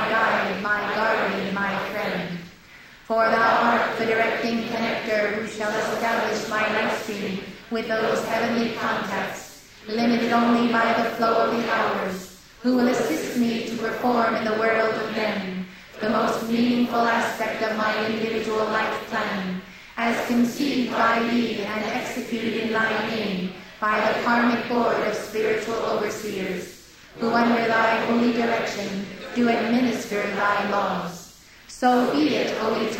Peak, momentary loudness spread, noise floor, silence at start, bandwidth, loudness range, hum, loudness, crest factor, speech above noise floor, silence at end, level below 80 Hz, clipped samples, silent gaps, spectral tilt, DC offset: -6 dBFS; 10 LU; -47 dBFS; 0 s; 16 kHz; 2 LU; none; -23 LUFS; 16 dB; 24 dB; 0 s; -58 dBFS; under 0.1%; none; -4.5 dB/octave; under 0.1%